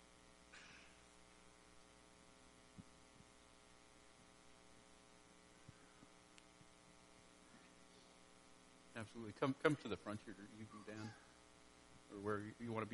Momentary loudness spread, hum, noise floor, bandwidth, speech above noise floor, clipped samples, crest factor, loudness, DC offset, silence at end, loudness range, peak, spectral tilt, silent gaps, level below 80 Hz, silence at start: 20 LU; none; -67 dBFS; 11.5 kHz; 21 dB; under 0.1%; 34 dB; -47 LUFS; under 0.1%; 0 s; 18 LU; -18 dBFS; -5.5 dB/octave; none; -78 dBFS; 0 s